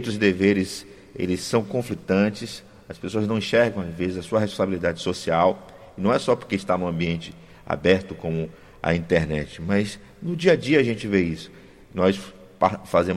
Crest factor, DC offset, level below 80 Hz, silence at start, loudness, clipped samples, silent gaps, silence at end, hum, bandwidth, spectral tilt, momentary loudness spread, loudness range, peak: 18 dB; under 0.1%; -52 dBFS; 0 s; -23 LUFS; under 0.1%; none; 0 s; none; 14.5 kHz; -6 dB/octave; 15 LU; 2 LU; -4 dBFS